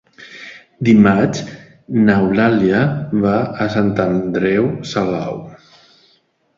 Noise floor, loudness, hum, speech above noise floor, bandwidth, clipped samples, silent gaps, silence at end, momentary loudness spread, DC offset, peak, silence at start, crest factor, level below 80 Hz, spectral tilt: -58 dBFS; -16 LUFS; none; 44 dB; 7.4 kHz; under 0.1%; none; 1 s; 18 LU; under 0.1%; 0 dBFS; 0.2 s; 16 dB; -48 dBFS; -7.5 dB/octave